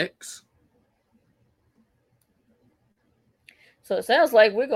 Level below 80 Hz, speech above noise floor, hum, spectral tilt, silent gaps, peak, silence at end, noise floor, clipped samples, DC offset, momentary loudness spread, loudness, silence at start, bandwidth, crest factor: -74 dBFS; 48 dB; none; -3 dB/octave; none; -4 dBFS; 0 s; -68 dBFS; under 0.1%; under 0.1%; 23 LU; -20 LUFS; 0 s; 16 kHz; 22 dB